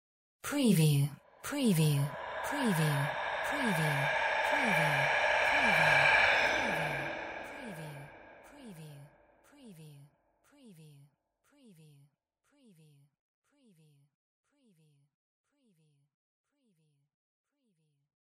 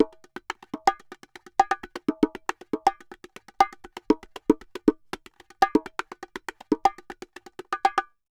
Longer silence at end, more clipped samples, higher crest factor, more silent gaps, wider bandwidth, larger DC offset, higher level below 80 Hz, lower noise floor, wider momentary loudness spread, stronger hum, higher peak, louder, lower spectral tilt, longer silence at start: first, 7.4 s vs 0.25 s; neither; about the same, 22 dB vs 24 dB; neither; about the same, 16 kHz vs 16.5 kHz; neither; second, -66 dBFS vs -56 dBFS; first, -78 dBFS vs -48 dBFS; about the same, 19 LU vs 19 LU; neither; second, -12 dBFS vs -4 dBFS; about the same, -29 LUFS vs -27 LUFS; about the same, -5 dB/octave vs -4.5 dB/octave; first, 0.45 s vs 0 s